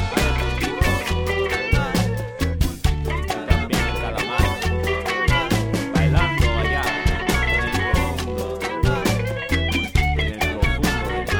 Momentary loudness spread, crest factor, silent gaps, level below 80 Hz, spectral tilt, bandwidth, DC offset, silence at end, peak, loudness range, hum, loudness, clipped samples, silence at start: 5 LU; 18 dB; none; -26 dBFS; -5 dB/octave; over 20 kHz; under 0.1%; 0 s; -2 dBFS; 2 LU; none; -21 LUFS; under 0.1%; 0 s